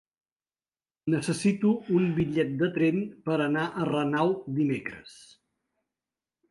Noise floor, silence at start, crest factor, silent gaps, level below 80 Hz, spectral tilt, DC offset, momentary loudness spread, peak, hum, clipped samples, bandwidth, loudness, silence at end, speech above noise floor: under -90 dBFS; 1.05 s; 16 dB; none; -64 dBFS; -6.5 dB/octave; under 0.1%; 6 LU; -12 dBFS; none; under 0.1%; 11.5 kHz; -27 LUFS; 1.35 s; over 63 dB